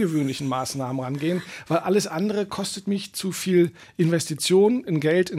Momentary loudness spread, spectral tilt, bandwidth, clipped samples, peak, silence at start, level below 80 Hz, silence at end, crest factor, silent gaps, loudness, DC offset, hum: 8 LU; -5.5 dB/octave; 16 kHz; under 0.1%; -10 dBFS; 0 s; -66 dBFS; 0 s; 14 dB; none; -24 LUFS; under 0.1%; none